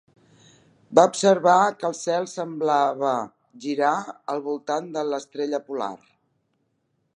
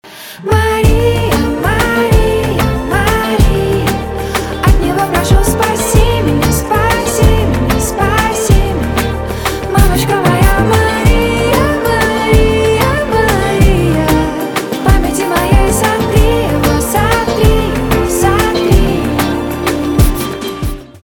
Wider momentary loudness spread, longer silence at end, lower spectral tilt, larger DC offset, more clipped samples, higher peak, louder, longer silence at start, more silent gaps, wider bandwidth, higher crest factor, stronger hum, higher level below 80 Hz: first, 13 LU vs 5 LU; first, 1.2 s vs 0.05 s; about the same, -4.5 dB/octave vs -5.5 dB/octave; neither; neither; about the same, 0 dBFS vs 0 dBFS; second, -23 LUFS vs -12 LUFS; first, 0.9 s vs 0.05 s; neither; second, 11 kHz vs 19.5 kHz; first, 24 dB vs 10 dB; neither; second, -78 dBFS vs -16 dBFS